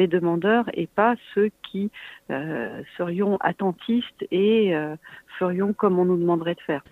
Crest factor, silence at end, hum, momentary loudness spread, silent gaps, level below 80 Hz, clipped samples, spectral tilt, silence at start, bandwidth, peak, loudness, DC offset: 18 dB; 0.1 s; none; 11 LU; none; -66 dBFS; under 0.1%; -8.5 dB/octave; 0 s; 4.2 kHz; -6 dBFS; -24 LUFS; under 0.1%